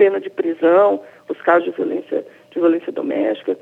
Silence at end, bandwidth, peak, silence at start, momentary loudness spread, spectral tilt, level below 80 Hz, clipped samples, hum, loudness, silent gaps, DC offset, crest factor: 0.05 s; 4 kHz; -2 dBFS; 0 s; 12 LU; -7.5 dB/octave; -82 dBFS; under 0.1%; none; -18 LUFS; none; under 0.1%; 16 dB